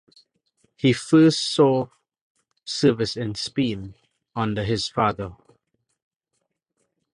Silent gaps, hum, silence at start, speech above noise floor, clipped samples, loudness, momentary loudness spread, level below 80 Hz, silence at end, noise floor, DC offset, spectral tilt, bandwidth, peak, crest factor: 2.21-2.35 s; none; 0.85 s; 56 dB; under 0.1%; -22 LUFS; 18 LU; -54 dBFS; 1.8 s; -77 dBFS; under 0.1%; -5.5 dB/octave; 11 kHz; -4 dBFS; 20 dB